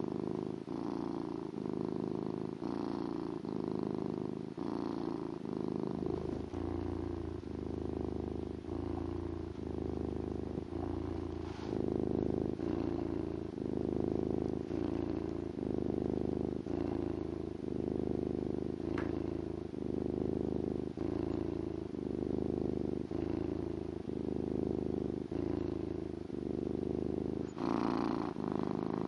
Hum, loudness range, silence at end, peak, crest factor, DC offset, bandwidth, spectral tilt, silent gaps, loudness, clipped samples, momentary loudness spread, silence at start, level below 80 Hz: none; 3 LU; 0 s; -20 dBFS; 18 dB; under 0.1%; 10.5 kHz; -9 dB/octave; none; -38 LUFS; under 0.1%; 5 LU; 0 s; -54 dBFS